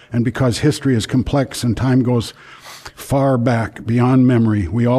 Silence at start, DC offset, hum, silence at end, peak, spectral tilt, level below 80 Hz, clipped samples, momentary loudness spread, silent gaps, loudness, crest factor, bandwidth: 0.1 s; under 0.1%; none; 0 s; -4 dBFS; -7 dB/octave; -38 dBFS; under 0.1%; 13 LU; none; -16 LUFS; 12 dB; 14 kHz